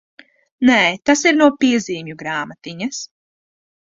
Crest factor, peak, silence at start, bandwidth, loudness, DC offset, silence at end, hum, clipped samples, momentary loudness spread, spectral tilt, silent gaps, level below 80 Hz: 18 dB; -2 dBFS; 0.6 s; 7.8 kHz; -16 LUFS; under 0.1%; 0.9 s; none; under 0.1%; 15 LU; -3.5 dB/octave; none; -60 dBFS